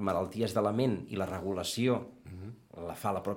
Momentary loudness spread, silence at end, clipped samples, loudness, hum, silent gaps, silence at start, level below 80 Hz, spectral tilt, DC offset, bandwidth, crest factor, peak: 17 LU; 0 s; under 0.1%; -33 LUFS; none; none; 0 s; -64 dBFS; -6 dB/octave; under 0.1%; 16.5 kHz; 18 dB; -14 dBFS